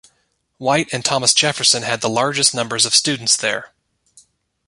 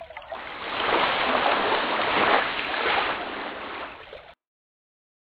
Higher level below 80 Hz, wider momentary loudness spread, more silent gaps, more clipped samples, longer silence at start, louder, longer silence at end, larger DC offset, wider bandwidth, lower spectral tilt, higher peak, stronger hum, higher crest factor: about the same, -60 dBFS vs -56 dBFS; second, 6 LU vs 15 LU; neither; neither; first, 0.6 s vs 0 s; first, -16 LUFS vs -24 LUFS; about the same, 1 s vs 1 s; neither; first, 16 kHz vs 6.6 kHz; second, -1.5 dB/octave vs -5.5 dB/octave; first, 0 dBFS vs -6 dBFS; neither; about the same, 20 dB vs 22 dB